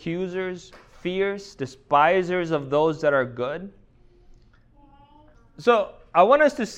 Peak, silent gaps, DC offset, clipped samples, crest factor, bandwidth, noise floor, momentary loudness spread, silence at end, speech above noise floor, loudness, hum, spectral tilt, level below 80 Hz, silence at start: -4 dBFS; none; under 0.1%; under 0.1%; 20 dB; 9.8 kHz; -54 dBFS; 16 LU; 0 s; 32 dB; -22 LUFS; none; -6 dB/octave; -56 dBFS; 0 s